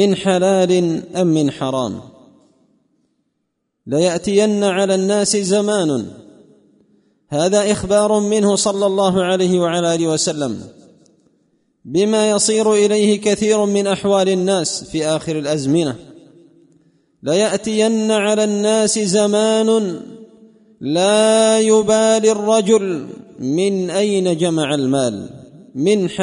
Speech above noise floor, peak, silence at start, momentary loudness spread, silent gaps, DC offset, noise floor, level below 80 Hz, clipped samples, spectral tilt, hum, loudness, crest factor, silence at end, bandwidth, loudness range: 57 dB; -2 dBFS; 0 s; 10 LU; none; under 0.1%; -72 dBFS; -54 dBFS; under 0.1%; -4.5 dB/octave; none; -16 LUFS; 14 dB; 0 s; 11 kHz; 5 LU